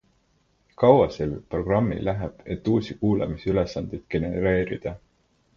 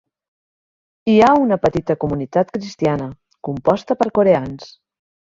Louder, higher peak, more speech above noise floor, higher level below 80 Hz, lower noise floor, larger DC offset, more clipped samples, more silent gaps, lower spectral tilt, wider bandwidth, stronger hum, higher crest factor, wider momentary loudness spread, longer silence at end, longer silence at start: second, -24 LUFS vs -17 LUFS; about the same, -2 dBFS vs -2 dBFS; second, 42 dB vs over 73 dB; first, -44 dBFS vs -50 dBFS; second, -66 dBFS vs under -90 dBFS; neither; neither; neither; about the same, -8.5 dB/octave vs -7.5 dB/octave; about the same, 7.2 kHz vs 7.6 kHz; neither; about the same, 22 dB vs 18 dB; second, 13 LU vs 16 LU; about the same, 0.6 s vs 0.65 s; second, 0.8 s vs 1.05 s